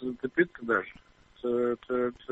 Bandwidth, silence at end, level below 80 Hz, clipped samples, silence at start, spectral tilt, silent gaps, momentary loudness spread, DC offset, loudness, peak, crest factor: 4.1 kHz; 0 s; -62 dBFS; under 0.1%; 0 s; -8 dB/octave; none; 5 LU; under 0.1%; -30 LUFS; -10 dBFS; 20 dB